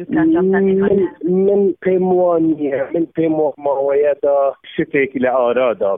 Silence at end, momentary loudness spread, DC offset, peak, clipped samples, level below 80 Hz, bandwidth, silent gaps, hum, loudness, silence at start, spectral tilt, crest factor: 0 s; 5 LU; under 0.1%; -4 dBFS; under 0.1%; -52 dBFS; 3.7 kHz; none; none; -16 LUFS; 0 s; -11.5 dB/octave; 12 dB